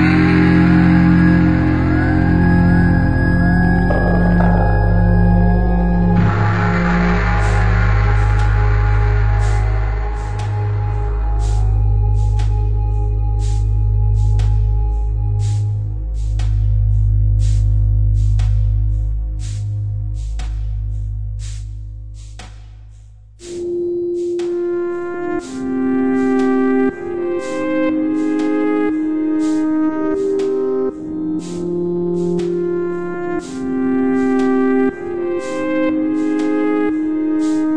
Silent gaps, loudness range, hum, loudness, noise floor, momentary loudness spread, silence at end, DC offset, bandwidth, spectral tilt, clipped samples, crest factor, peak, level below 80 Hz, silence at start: none; 9 LU; none; -17 LUFS; -40 dBFS; 10 LU; 0 s; under 0.1%; 9 kHz; -8.5 dB/octave; under 0.1%; 14 dB; 0 dBFS; -20 dBFS; 0 s